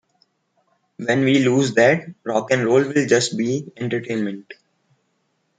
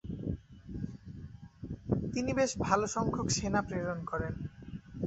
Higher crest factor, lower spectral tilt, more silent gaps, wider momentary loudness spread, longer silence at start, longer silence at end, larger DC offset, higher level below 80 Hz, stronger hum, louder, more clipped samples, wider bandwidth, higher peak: about the same, 18 dB vs 22 dB; about the same, -5 dB/octave vs -5 dB/octave; neither; second, 10 LU vs 17 LU; first, 1 s vs 0.05 s; first, 1.05 s vs 0 s; neither; second, -66 dBFS vs -50 dBFS; neither; first, -19 LUFS vs -34 LUFS; neither; first, 9.6 kHz vs 8.2 kHz; first, -2 dBFS vs -12 dBFS